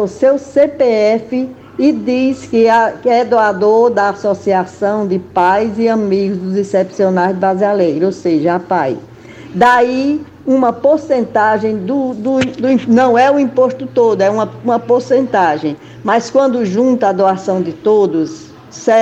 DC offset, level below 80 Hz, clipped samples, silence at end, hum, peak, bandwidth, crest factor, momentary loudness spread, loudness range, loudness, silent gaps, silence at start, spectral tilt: under 0.1%; -54 dBFS; under 0.1%; 0 s; none; -2 dBFS; 8.6 kHz; 12 dB; 7 LU; 2 LU; -13 LUFS; none; 0 s; -6.5 dB/octave